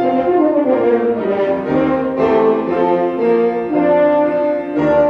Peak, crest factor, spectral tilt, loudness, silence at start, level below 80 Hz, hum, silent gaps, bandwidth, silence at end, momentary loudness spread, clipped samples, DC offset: -2 dBFS; 12 dB; -8.5 dB/octave; -15 LUFS; 0 s; -50 dBFS; none; none; 6.2 kHz; 0 s; 4 LU; under 0.1%; under 0.1%